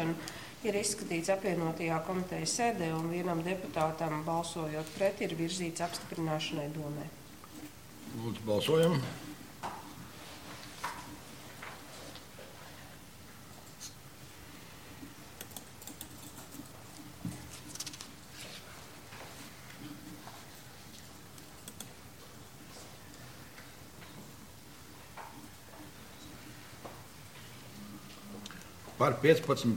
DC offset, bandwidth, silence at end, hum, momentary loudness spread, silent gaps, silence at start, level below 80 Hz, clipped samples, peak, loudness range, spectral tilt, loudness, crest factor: 0.1%; 17 kHz; 0 s; none; 18 LU; none; 0 s; -64 dBFS; under 0.1%; -10 dBFS; 16 LU; -4.5 dB/octave; -36 LUFS; 26 dB